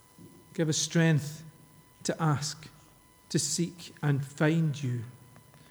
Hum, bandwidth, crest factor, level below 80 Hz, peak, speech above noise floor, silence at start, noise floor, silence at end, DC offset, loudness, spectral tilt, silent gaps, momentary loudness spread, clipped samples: none; over 20 kHz; 20 dB; -70 dBFS; -12 dBFS; 30 dB; 0.2 s; -58 dBFS; 0.3 s; under 0.1%; -30 LUFS; -5 dB/octave; none; 16 LU; under 0.1%